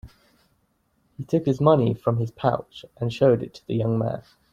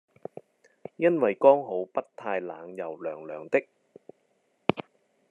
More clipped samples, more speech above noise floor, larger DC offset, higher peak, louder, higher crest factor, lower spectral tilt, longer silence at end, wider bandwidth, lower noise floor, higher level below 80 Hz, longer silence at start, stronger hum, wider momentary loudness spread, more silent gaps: neither; about the same, 46 dB vs 45 dB; neither; about the same, -4 dBFS vs -4 dBFS; first, -23 LUFS vs -27 LUFS; second, 20 dB vs 26 dB; about the same, -8.5 dB/octave vs -8 dB/octave; second, 0.3 s vs 0.5 s; about the same, 7.4 kHz vs 7 kHz; about the same, -68 dBFS vs -71 dBFS; first, -56 dBFS vs -76 dBFS; second, 0.05 s vs 1 s; neither; second, 12 LU vs 24 LU; neither